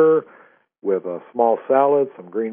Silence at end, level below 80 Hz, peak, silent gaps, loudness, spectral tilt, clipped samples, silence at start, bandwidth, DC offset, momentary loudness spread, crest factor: 0 s; -78 dBFS; -4 dBFS; none; -20 LUFS; -6.5 dB/octave; under 0.1%; 0 s; 3.5 kHz; under 0.1%; 11 LU; 16 dB